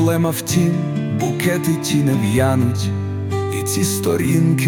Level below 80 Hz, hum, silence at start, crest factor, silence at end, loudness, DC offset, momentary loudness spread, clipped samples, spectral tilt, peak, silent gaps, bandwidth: -48 dBFS; none; 0 s; 14 dB; 0 s; -18 LUFS; under 0.1%; 6 LU; under 0.1%; -5.5 dB/octave; -4 dBFS; none; 19 kHz